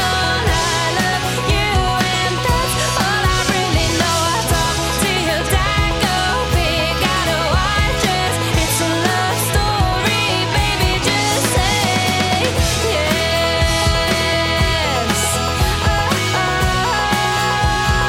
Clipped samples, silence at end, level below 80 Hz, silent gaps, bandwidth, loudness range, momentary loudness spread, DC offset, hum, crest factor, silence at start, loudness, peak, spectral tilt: under 0.1%; 0 s; -26 dBFS; none; 16.5 kHz; 1 LU; 1 LU; under 0.1%; none; 14 dB; 0 s; -16 LUFS; -2 dBFS; -3.5 dB/octave